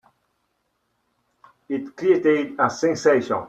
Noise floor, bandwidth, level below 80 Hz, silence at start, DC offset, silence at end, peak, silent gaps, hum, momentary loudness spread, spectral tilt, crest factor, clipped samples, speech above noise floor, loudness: -72 dBFS; 8.4 kHz; -68 dBFS; 1.7 s; under 0.1%; 0 s; -4 dBFS; none; none; 12 LU; -5.5 dB/octave; 20 dB; under 0.1%; 52 dB; -21 LUFS